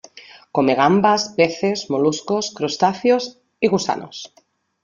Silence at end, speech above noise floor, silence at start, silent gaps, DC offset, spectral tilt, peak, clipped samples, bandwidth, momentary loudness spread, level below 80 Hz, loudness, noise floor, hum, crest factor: 0.55 s; 25 dB; 0.15 s; none; under 0.1%; -4.5 dB/octave; -2 dBFS; under 0.1%; 7.4 kHz; 12 LU; -62 dBFS; -19 LUFS; -44 dBFS; none; 18 dB